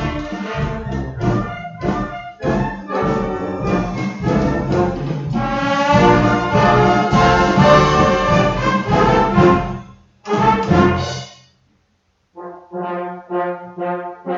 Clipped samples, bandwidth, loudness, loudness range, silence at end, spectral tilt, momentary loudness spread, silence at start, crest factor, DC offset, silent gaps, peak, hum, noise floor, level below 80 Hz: under 0.1%; 7.6 kHz; -16 LUFS; 9 LU; 0 s; -6.5 dB/octave; 14 LU; 0 s; 16 dB; under 0.1%; none; 0 dBFS; none; -63 dBFS; -32 dBFS